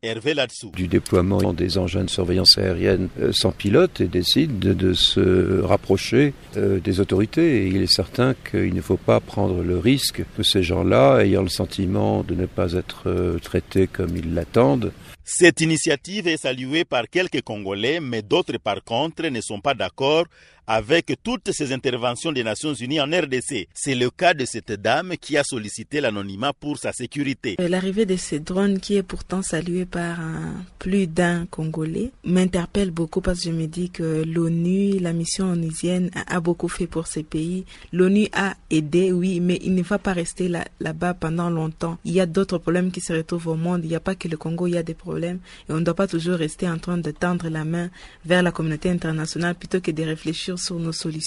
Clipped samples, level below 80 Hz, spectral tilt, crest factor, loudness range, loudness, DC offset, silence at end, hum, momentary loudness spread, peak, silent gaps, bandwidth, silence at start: under 0.1%; -44 dBFS; -5 dB/octave; 20 dB; 6 LU; -22 LUFS; under 0.1%; 0 s; none; 9 LU; 0 dBFS; none; 15 kHz; 0.05 s